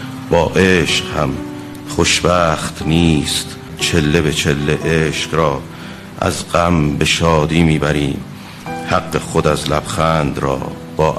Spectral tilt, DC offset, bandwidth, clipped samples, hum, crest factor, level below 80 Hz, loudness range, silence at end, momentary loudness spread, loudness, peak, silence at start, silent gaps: -4.5 dB/octave; under 0.1%; 13.5 kHz; under 0.1%; none; 16 dB; -32 dBFS; 2 LU; 0 s; 13 LU; -15 LUFS; 0 dBFS; 0 s; none